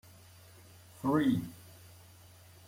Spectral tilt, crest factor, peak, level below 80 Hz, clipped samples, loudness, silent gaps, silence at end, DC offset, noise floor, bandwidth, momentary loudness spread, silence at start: -7 dB/octave; 18 dB; -18 dBFS; -70 dBFS; under 0.1%; -32 LUFS; none; 0.8 s; under 0.1%; -57 dBFS; 16.5 kHz; 27 LU; 1.05 s